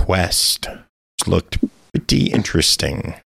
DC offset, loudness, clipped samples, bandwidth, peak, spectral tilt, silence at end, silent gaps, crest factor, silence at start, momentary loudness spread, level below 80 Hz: under 0.1%; -18 LUFS; under 0.1%; 16 kHz; -2 dBFS; -3.5 dB/octave; 0.15 s; 0.89-1.18 s; 16 dB; 0 s; 10 LU; -34 dBFS